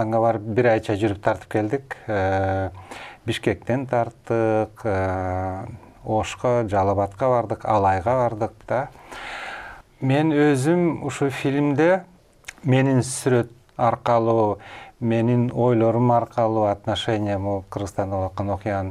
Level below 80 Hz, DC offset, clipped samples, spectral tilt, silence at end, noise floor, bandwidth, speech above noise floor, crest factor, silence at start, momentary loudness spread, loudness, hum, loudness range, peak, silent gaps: -52 dBFS; under 0.1%; under 0.1%; -6.5 dB/octave; 0 s; -44 dBFS; 13 kHz; 23 dB; 18 dB; 0 s; 13 LU; -22 LUFS; none; 4 LU; -4 dBFS; none